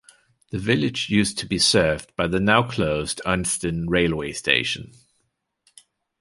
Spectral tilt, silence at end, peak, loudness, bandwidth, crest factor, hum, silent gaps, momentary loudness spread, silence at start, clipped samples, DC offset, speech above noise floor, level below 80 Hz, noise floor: -4 dB/octave; 1.35 s; -2 dBFS; -21 LUFS; 11.5 kHz; 22 dB; none; none; 7 LU; 0.55 s; under 0.1%; under 0.1%; 51 dB; -44 dBFS; -73 dBFS